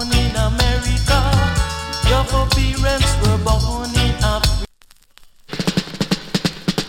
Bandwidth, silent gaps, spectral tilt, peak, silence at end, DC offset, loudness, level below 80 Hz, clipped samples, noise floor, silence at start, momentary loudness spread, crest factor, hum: 17 kHz; none; -4.5 dB/octave; -2 dBFS; 0 s; under 0.1%; -18 LUFS; -22 dBFS; under 0.1%; -49 dBFS; 0 s; 6 LU; 14 dB; none